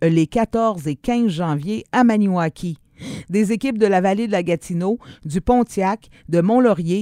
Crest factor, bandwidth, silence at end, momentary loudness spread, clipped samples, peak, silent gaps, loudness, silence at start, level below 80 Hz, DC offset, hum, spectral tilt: 16 dB; 13.5 kHz; 0 s; 11 LU; under 0.1%; -2 dBFS; none; -19 LUFS; 0 s; -44 dBFS; under 0.1%; none; -7 dB/octave